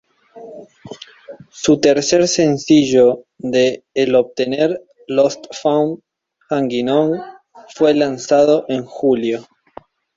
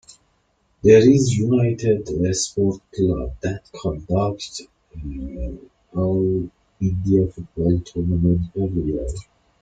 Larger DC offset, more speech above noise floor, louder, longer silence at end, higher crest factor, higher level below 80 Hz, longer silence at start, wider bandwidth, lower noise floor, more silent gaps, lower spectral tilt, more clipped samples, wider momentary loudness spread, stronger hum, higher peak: neither; second, 27 dB vs 45 dB; first, -16 LUFS vs -20 LUFS; first, 0.75 s vs 0.4 s; about the same, 16 dB vs 18 dB; second, -56 dBFS vs -38 dBFS; first, 0.35 s vs 0.1 s; second, 7.8 kHz vs 9.4 kHz; second, -42 dBFS vs -65 dBFS; neither; second, -4.5 dB/octave vs -6.5 dB/octave; neither; first, 21 LU vs 16 LU; neither; about the same, -2 dBFS vs -2 dBFS